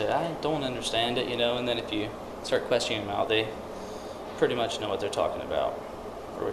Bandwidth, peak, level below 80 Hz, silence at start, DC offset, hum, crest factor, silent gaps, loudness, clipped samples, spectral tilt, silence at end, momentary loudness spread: 13 kHz; -10 dBFS; -54 dBFS; 0 s; under 0.1%; none; 20 dB; none; -29 LUFS; under 0.1%; -4 dB/octave; 0 s; 12 LU